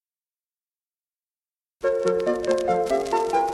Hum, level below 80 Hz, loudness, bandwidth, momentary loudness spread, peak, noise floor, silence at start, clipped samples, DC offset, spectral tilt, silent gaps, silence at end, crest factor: none; -56 dBFS; -23 LUFS; 13 kHz; 2 LU; -8 dBFS; under -90 dBFS; 1.8 s; under 0.1%; under 0.1%; -5 dB/octave; none; 0 s; 18 dB